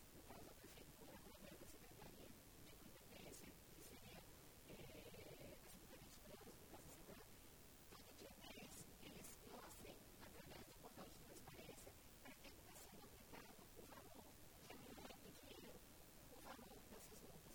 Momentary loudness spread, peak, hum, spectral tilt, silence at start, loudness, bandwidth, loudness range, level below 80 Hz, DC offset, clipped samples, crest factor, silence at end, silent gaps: 4 LU; -44 dBFS; none; -3.5 dB/octave; 0 s; -61 LUFS; over 20 kHz; 2 LU; -72 dBFS; under 0.1%; under 0.1%; 18 dB; 0 s; none